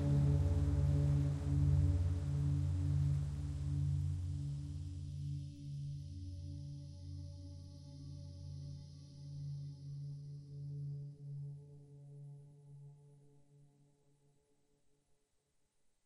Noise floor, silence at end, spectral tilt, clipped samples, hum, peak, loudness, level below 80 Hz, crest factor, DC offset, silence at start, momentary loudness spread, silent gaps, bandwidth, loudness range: -80 dBFS; 2.4 s; -8.5 dB/octave; under 0.1%; none; -22 dBFS; -39 LUFS; -48 dBFS; 16 dB; under 0.1%; 0 s; 21 LU; none; 9.6 kHz; 18 LU